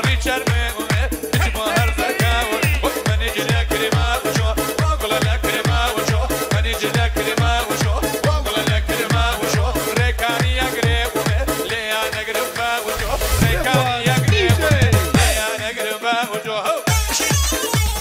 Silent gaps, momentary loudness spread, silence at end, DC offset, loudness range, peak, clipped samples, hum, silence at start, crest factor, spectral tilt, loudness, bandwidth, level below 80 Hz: none; 5 LU; 0 s; under 0.1%; 2 LU; -2 dBFS; under 0.1%; none; 0 s; 16 dB; -4 dB/octave; -18 LUFS; 16.5 kHz; -26 dBFS